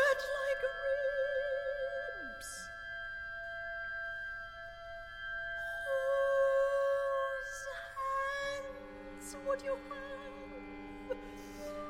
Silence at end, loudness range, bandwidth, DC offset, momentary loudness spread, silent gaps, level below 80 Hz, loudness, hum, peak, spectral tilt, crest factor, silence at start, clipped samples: 0 s; 8 LU; 15.5 kHz; under 0.1%; 16 LU; none; -60 dBFS; -37 LUFS; none; -20 dBFS; -3 dB/octave; 18 dB; 0 s; under 0.1%